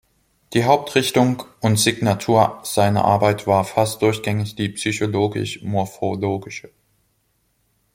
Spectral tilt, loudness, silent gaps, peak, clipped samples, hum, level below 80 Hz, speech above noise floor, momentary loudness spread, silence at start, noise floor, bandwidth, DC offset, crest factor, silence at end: -5 dB/octave; -19 LUFS; none; -2 dBFS; under 0.1%; none; -56 dBFS; 47 dB; 8 LU; 0.5 s; -66 dBFS; 16.5 kHz; under 0.1%; 18 dB; 1.35 s